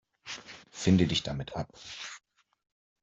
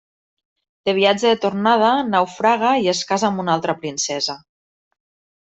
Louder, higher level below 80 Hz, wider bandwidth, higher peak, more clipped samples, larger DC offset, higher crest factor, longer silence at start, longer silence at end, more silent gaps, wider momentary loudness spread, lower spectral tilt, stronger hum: second, -30 LUFS vs -18 LUFS; first, -58 dBFS vs -64 dBFS; about the same, 7.8 kHz vs 8.4 kHz; second, -10 dBFS vs -2 dBFS; neither; neither; first, 22 dB vs 16 dB; second, 0.25 s vs 0.85 s; second, 0.85 s vs 1.05 s; neither; first, 18 LU vs 8 LU; first, -5.5 dB/octave vs -3.5 dB/octave; neither